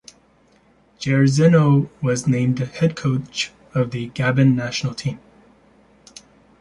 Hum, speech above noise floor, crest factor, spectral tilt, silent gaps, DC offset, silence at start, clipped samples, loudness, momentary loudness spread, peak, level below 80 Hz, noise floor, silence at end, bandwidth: none; 38 dB; 16 dB; -6.5 dB/octave; none; under 0.1%; 1 s; under 0.1%; -19 LUFS; 11 LU; -4 dBFS; -54 dBFS; -56 dBFS; 1.45 s; 11.5 kHz